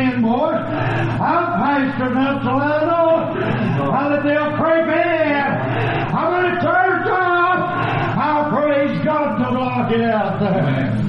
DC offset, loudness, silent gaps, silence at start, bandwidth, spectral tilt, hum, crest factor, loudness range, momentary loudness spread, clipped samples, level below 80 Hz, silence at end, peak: 0.4%; -17 LUFS; none; 0 s; 6 kHz; -9 dB/octave; none; 12 dB; 1 LU; 4 LU; under 0.1%; -46 dBFS; 0 s; -6 dBFS